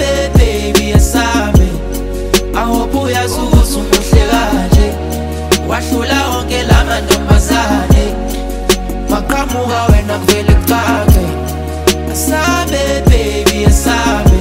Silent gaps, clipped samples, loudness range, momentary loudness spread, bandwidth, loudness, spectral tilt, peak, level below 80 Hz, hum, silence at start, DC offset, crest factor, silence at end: none; under 0.1%; 1 LU; 6 LU; 16.5 kHz; -12 LUFS; -5 dB/octave; 0 dBFS; -14 dBFS; none; 0 s; under 0.1%; 10 dB; 0 s